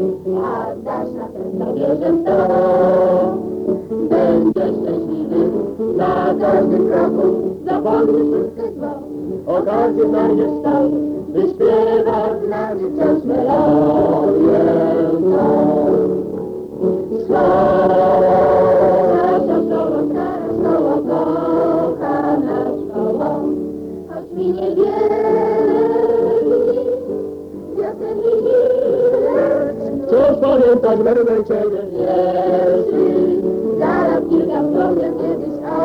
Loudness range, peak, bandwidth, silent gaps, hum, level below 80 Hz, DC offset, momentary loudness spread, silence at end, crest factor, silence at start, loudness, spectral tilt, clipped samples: 3 LU; -4 dBFS; 6.4 kHz; none; none; -48 dBFS; under 0.1%; 9 LU; 0 s; 12 dB; 0 s; -16 LUFS; -9 dB/octave; under 0.1%